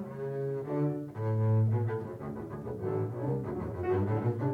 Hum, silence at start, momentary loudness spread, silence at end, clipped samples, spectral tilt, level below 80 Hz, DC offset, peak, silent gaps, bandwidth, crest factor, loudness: none; 0 s; 11 LU; 0 s; under 0.1%; -10.5 dB/octave; -60 dBFS; under 0.1%; -20 dBFS; none; 3.4 kHz; 12 dB; -33 LUFS